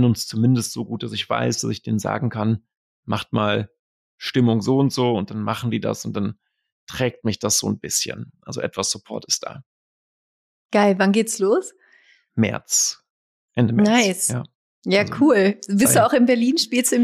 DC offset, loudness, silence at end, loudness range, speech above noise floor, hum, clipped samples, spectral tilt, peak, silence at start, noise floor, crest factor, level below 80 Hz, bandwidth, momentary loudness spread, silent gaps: under 0.1%; -20 LUFS; 0 s; 6 LU; 36 dB; none; under 0.1%; -4.5 dB/octave; -4 dBFS; 0 s; -56 dBFS; 16 dB; -60 dBFS; 15.5 kHz; 12 LU; 2.77-3.03 s, 3.79-4.18 s, 6.72-6.87 s, 9.66-10.69 s, 13.10-13.48 s, 14.55-14.82 s